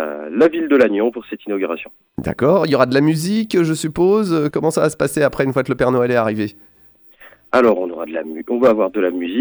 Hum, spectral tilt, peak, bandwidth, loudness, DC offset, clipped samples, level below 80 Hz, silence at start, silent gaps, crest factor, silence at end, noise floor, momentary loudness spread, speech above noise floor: none; -6 dB/octave; 0 dBFS; over 20 kHz; -17 LUFS; under 0.1%; under 0.1%; -50 dBFS; 0 s; none; 16 dB; 0 s; -48 dBFS; 11 LU; 32 dB